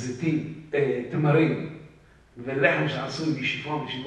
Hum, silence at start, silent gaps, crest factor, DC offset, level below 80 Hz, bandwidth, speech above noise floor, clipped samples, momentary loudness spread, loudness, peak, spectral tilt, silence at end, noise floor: none; 0 s; none; 20 dB; under 0.1%; -60 dBFS; 9.2 kHz; 28 dB; under 0.1%; 11 LU; -25 LUFS; -6 dBFS; -6.5 dB/octave; 0 s; -53 dBFS